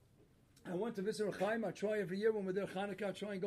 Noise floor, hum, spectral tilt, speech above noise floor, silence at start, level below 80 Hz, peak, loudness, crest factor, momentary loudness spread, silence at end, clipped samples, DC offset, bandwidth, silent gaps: -68 dBFS; none; -6 dB/octave; 29 dB; 0.65 s; -76 dBFS; -24 dBFS; -39 LUFS; 16 dB; 6 LU; 0 s; under 0.1%; under 0.1%; 13.5 kHz; none